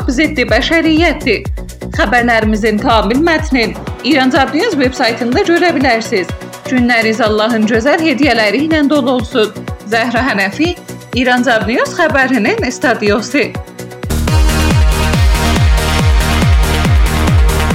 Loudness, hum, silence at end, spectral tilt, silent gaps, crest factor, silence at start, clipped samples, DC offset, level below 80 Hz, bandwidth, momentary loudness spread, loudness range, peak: -12 LUFS; none; 0 s; -5.5 dB/octave; none; 12 dB; 0 s; under 0.1%; under 0.1%; -18 dBFS; 16.5 kHz; 7 LU; 2 LU; 0 dBFS